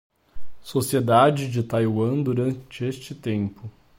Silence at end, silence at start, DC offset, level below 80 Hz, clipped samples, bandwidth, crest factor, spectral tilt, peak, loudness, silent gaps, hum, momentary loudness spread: 0.05 s; 0.35 s; under 0.1%; -52 dBFS; under 0.1%; 16.5 kHz; 18 dB; -6.5 dB/octave; -6 dBFS; -23 LUFS; none; none; 13 LU